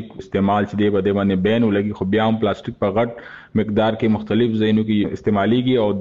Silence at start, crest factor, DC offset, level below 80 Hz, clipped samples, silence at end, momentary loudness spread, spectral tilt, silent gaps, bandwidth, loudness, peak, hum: 0 s; 12 dB; 0.2%; -50 dBFS; under 0.1%; 0 s; 6 LU; -8.5 dB/octave; none; 7.2 kHz; -19 LUFS; -6 dBFS; none